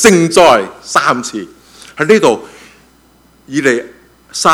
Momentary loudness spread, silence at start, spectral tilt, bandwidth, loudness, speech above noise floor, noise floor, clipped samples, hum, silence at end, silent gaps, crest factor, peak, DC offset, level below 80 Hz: 17 LU; 0 s; -3.5 dB/octave; 17.5 kHz; -11 LUFS; 37 dB; -48 dBFS; 0.8%; none; 0 s; none; 12 dB; 0 dBFS; under 0.1%; -48 dBFS